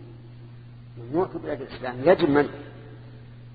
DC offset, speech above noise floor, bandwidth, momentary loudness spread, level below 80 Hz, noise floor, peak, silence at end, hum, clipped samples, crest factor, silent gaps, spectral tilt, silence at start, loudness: under 0.1%; 20 dB; 4.9 kHz; 25 LU; -54 dBFS; -44 dBFS; -4 dBFS; 0 s; none; under 0.1%; 22 dB; none; -10 dB/octave; 0 s; -24 LUFS